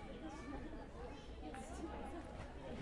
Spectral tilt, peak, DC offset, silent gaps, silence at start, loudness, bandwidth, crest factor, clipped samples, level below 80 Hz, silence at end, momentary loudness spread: -6 dB/octave; -36 dBFS; under 0.1%; none; 0 s; -51 LUFS; 11.5 kHz; 14 dB; under 0.1%; -54 dBFS; 0 s; 4 LU